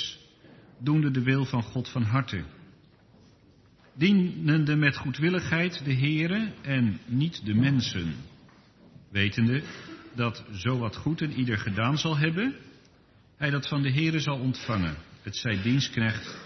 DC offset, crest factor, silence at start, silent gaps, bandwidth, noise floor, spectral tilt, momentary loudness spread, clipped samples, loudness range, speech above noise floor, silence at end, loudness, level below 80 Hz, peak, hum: under 0.1%; 22 dB; 0 s; none; 6.4 kHz; -59 dBFS; -6 dB/octave; 10 LU; under 0.1%; 4 LU; 32 dB; 0 s; -27 LUFS; -58 dBFS; -6 dBFS; none